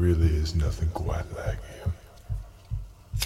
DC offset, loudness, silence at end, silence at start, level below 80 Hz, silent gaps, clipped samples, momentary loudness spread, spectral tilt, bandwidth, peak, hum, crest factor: under 0.1%; -30 LUFS; 0 s; 0 s; -32 dBFS; none; under 0.1%; 14 LU; -6 dB/octave; 15.5 kHz; -12 dBFS; none; 16 dB